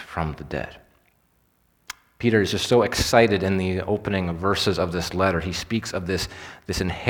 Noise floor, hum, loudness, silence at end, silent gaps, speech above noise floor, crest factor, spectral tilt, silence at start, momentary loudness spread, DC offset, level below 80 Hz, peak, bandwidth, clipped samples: -65 dBFS; none; -23 LUFS; 0 s; none; 42 dB; 24 dB; -5 dB/octave; 0 s; 13 LU; under 0.1%; -42 dBFS; 0 dBFS; 19 kHz; under 0.1%